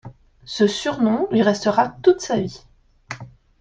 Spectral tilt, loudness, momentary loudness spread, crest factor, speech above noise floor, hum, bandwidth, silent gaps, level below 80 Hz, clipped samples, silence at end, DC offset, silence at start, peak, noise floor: -5 dB/octave; -19 LUFS; 18 LU; 18 dB; 20 dB; none; 9.4 kHz; none; -54 dBFS; under 0.1%; 0.35 s; under 0.1%; 0.05 s; -2 dBFS; -39 dBFS